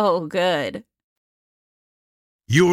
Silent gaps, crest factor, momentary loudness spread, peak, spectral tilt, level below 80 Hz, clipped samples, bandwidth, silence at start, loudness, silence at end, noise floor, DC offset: 1.04-2.39 s; 18 dB; 12 LU; -6 dBFS; -5.5 dB/octave; -60 dBFS; under 0.1%; 16 kHz; 0 s; -21 LUFS; 0 s; under -90 dBFS; under 0.1%